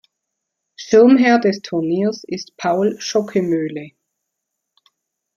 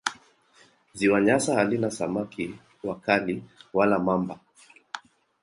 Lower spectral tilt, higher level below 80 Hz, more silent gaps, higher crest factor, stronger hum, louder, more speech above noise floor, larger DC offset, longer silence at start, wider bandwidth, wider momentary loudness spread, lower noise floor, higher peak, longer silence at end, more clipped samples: about the same, -5.5 dB/octave vs -5 dB/octave; about the same, -64 dBFS vs -62 dBFS; neither; second, 16 dB vs 22 dB; neither; first, -17 LUFS vs -26 LUFS; first, 62 dB vs 35 dB; neither; first, 0.8 s vs 0.05 s; second, 7.2 kHz vs 11.5 kHz; about the same, 17 LU vs 19 LU; first, -78 dBFS vs -59 dBFS; first, -2 dBFS vs -6 dBFS; first, 1.5 s vs 0.45 s; neither